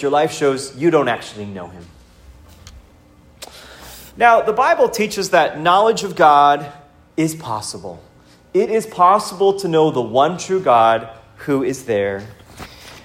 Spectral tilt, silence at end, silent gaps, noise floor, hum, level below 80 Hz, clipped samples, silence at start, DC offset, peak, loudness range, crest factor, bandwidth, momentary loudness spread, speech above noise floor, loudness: -4.5 dB/octave; 0.05 s; none; -48 dBFS; none; -52 dBFS; under 0.1%; 0 s; under 0.1%; 0 dBFS; 8 LU; 18 dB; 16 kHz; 23 LU; 32 dB; -16 LUFS